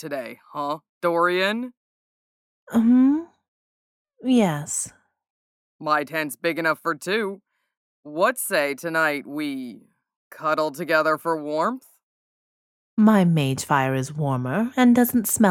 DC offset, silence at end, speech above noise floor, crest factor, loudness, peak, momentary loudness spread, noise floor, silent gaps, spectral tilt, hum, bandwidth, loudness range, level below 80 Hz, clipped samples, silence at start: under 0.1%; 0 s; over 68 dB; 20 dB; -22 LUFS; -4 dBFS; 14 LU; under -90 dBFS; 0.89-1.01 s, 1.77-2.67 s, 3.48-4.05 s, 5.30-5.79 s, 7.77-8.03 s, 10.16-10.31 s, 12.03-12.97 s; -5 dB/octave; none; 17 kHz; 4 LU; -66 dBFS; under 0.1%; 0 s